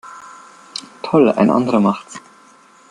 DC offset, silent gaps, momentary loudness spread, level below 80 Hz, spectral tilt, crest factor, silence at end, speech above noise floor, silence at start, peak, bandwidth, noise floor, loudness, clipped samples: under 0.1%; none; 23 LU; -60 dBFS; -6.5 dB/octave; 16 dB; 0.7 s; 33 dB; 0.05 s; -2 dBFS; 11 kHz; -48 dBFS; -16 LUFS; under 0.1%